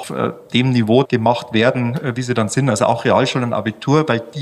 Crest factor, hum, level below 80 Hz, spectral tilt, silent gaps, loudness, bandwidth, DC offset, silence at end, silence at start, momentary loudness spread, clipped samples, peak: 16 dB; none; -56 dBFS; -6 dB/octave; none; -17 LUFS; 13 kHz; under 0.1%; 0 s; 0 s; 6 LU; under 0.1%; -2 dBFS